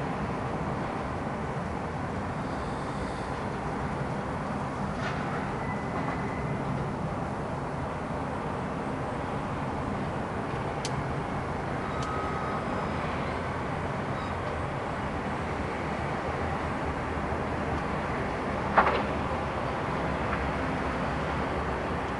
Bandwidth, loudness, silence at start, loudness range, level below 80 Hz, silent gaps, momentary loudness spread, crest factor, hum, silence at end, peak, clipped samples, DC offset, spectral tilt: 11.5 kHz; -31 LUFS; 0 s; 4 LU; -44 dBFS; none; 3 LU; 22 dB; none; 0 s; -8 dBFS; under 0.1%; under 0.1%; -6.5 dB/octave